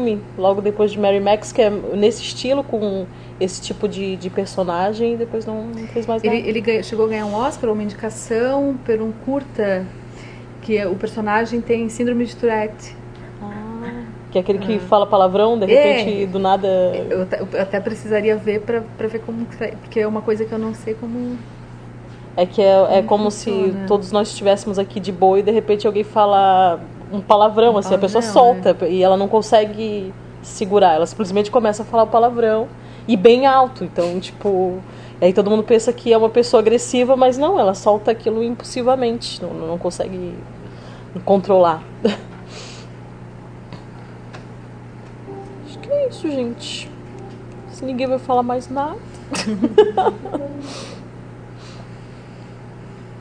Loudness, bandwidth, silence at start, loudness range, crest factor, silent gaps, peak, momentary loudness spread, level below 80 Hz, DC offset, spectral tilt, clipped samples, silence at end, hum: -18 LUFS; 10 kHz; 0 s; 9 LU; 18 dB; none; 0 dBFS; 22 LU; -48 dBFS; under 0.1%; -5.5 dB/octave; under 0.1%; 0 s; none